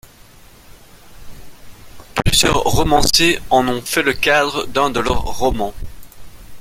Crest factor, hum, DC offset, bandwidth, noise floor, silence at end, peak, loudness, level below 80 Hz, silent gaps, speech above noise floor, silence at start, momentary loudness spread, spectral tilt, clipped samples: 18 dB; none; under 0.1%; 16.5 kHz; -43 dBFS; 0 s; 0 dBFS; -16 LUFS; -30 dBFS; none; 28 dB; 0.7 s; 12 LU; -3 dB/octave; under 0.1%